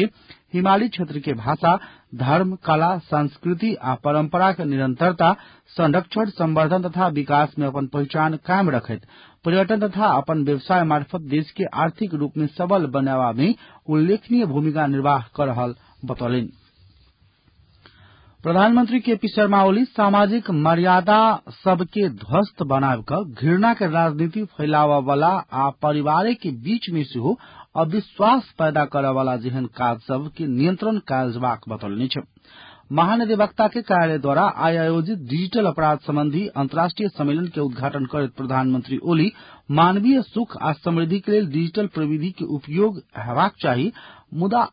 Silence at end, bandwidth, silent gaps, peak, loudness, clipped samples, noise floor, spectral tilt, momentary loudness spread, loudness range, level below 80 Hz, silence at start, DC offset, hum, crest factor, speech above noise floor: 0.05 s; 5.2 kHz; none; -6 dBFS; -21 LUFS; under 0.1%; -58 dBFS; -12 dB/octave; 8 LU; 4 LU; -58 dBFS; 0 s; under 0.1%; none; 16 dB; 38 dB